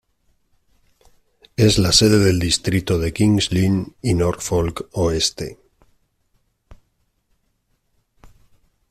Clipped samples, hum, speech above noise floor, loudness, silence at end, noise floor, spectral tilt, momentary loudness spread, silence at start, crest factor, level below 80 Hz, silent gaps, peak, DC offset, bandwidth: under 0.1%; none; 50 dB; -18 LUFS; 0.65 s; -67 dBFS; -4.5 dB/octave; 10 LU; 1.6 s; 20 dB; -40 dBFS; none; 0 dBFS; under 0.1%; 15 kHz